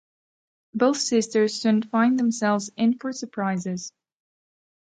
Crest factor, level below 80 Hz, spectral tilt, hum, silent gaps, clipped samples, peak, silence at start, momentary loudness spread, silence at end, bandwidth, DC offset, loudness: 18 dB; -74 dBFS; -4.5 dB/octave; none; none; under 0.1%; -8 dBFS; 0.75 s; 11 LU; 1 s; 9.4 kHz; under 0.1%; -23 LUFS